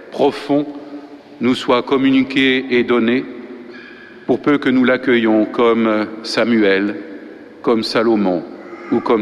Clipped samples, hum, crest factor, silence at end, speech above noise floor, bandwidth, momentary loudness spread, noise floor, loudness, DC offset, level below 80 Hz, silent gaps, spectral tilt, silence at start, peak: under 0.1%; none; 14 dB; 0 s; 22 dB; 11 kHz; 19 LU; -37 dBFS; -16 LUFS; under 0.1%; -56 dBFS; none; -6 dB/octave; 0 s; -2 dBFS